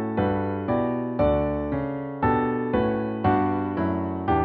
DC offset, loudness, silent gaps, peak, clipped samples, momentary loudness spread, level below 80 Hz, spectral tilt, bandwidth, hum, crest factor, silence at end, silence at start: under 0.1%; -25 LUFS; none; -8 dBFS; under 0.1%; 5 LU; -42 dBFS; -7.5 dB/octave; 4.8 kHz; none; 16 dB; 0 s; 0 s